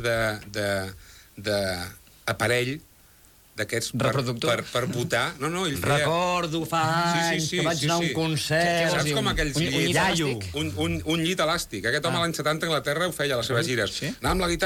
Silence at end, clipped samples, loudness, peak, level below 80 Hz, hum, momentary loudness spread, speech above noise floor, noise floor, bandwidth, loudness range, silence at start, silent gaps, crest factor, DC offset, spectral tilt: 0 s; under 0.1%; -25 LUFS; -10 dBFS; -46 dBFS; none; 7 LU; 30 dB; -55 dBFS; 18.5 kHz; 4 LU; 0 s; none; 16 dB; under 0.1%; -4 dB/octave